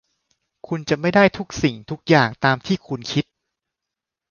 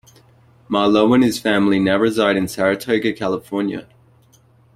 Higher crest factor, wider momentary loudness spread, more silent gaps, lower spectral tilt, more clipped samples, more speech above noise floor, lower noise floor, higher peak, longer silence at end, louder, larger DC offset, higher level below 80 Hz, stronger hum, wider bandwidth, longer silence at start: about the same, 20 dB vs 16 dB; first, 13 LU vs 9 LU; neither; about the same, -6 dB/octave vs -5.5 dB/octave; neither; first, 66 dB vs 36 dB; first, -85 dBFS vs -53 dBFS; about the same, -2 dBFS vs -2 dBFS; first, 1.1 s vs 0.9 s; second, -20 LUFS vs -17 LUFS; neither; about the same, -52 dBFS vs -54 dBFS; neither; second, 7.2 kHz vs 15.5 kHz; about the same, 0.7 s vs 0.7 s